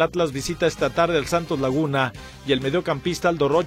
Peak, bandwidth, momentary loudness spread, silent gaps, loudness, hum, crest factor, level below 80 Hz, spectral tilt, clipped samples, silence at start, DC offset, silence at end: -4 dBFS; 15.5 kHz; 4 LU; none; -22 LUFS; none; 18 dB; -46 dBFS; -5 dB/octave; under 0.1%; 0 s; under 0.1%; 0 s